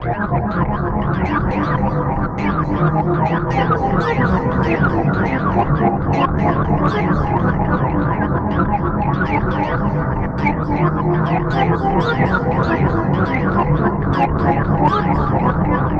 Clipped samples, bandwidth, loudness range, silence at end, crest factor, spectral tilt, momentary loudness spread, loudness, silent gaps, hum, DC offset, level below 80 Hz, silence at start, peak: under 0.1%; 6.6 kHz; 2 LU; 0 s; 14 dB; -9 dB/octave; 3 LU; -17 LUFS; none; none; under 0.1%; -28 dBFS; 0 s; -2 dBFS